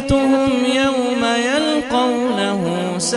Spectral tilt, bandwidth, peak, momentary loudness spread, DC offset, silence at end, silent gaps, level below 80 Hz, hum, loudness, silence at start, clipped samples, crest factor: -4 dB/octave; 11.5 kHz; -4 dBFS; 4 LU; under 0.1%; 0 s; none; -40 dBFS; none; -17 LUFS; 0 s; under 0.1%; 12 dB